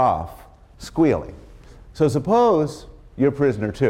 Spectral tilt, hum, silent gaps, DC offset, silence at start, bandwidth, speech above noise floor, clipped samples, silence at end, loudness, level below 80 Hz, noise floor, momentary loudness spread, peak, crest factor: -7.5 dB/octave; none; none; under 0.1%; 0 s; 15 kHz; 24 dB; under 0.1%; 0 s; -20 LUFS; -44 dBFS; -43 dBFS; 20 LU; -8 dBFS; 14 dB